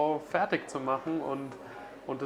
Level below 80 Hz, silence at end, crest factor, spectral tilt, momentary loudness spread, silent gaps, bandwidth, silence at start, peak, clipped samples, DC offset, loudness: -70 dBFS; 0 s; 20 dB; -6 dB/octave; 14 LU; none; 13.5 kHz; 0 s; -12 dBFS; under 0.1%; under 0.1%; -32 LUFS